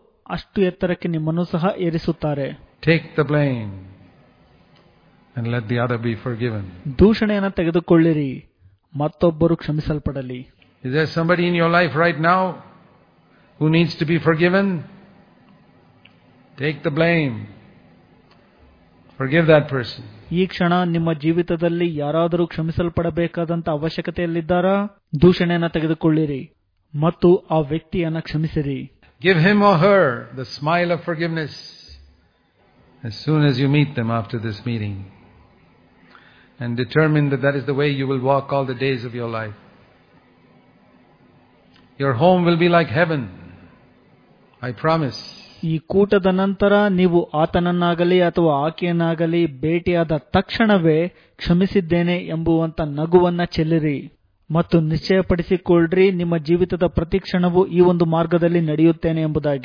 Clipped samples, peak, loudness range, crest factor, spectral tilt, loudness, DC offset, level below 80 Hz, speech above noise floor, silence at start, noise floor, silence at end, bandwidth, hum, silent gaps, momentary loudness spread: under 0.1%; -2 dBFS; 6 LU; 18 dB; -8.5 dB/octave; -19 LUFS; under 0.1%; -44 dBFS; 40 dB; 0.3 s; -59 dBFS; 0 s; 5.2 kHz; none; none; 13 LU